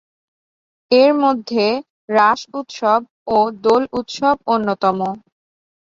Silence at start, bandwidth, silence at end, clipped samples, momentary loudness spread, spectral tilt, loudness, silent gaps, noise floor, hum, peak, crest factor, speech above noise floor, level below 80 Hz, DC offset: 0.9 s; 7.6 kHz; 0.8 s; under 0.1%; 10 LU; -5 dB/octave; -17 LUFS; 1.90-2.08 s, 3.10-3.26 s; under -90 dBFS; none; -2 dBFS; 16 dB; over 74 dB; -60 dBFS; under 0.1%